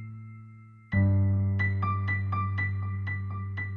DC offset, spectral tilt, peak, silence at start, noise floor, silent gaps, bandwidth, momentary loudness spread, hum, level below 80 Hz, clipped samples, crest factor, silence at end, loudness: under 0.1%; -10 dB/octave; -14 dBFS; 0 s; -49 dBFS; none; 4.2 kHz; 17 LU; none; -54 dBFS; under 0.1%; 14 dB; 0 s; -29 LUFS